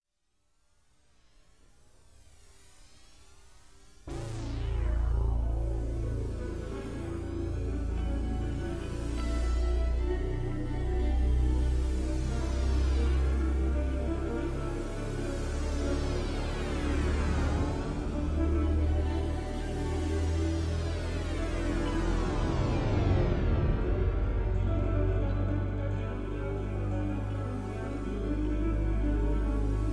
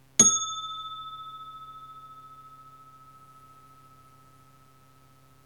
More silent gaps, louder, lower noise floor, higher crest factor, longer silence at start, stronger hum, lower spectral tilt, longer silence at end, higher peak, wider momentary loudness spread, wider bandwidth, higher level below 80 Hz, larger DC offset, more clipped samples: neither; second, -32 LUFS vs -24 LUFS; first, -77 dBFS vs -58 dBFS; second, 14 dB vs 28 dB; first, 2.8 s vs 0.2 s; neither; first, -7.5 dB/octave vs -0.5 dB/octave; second, 0 s vs 2.7 s; second, -16 dBFS vs -4 dBFS; second, 7 LU vs 30 LU; second, 11 kHz vs 19 kHz; first, -32 dBFS vs -66 dBFS; first, 0.2% vs under 0.1%; neither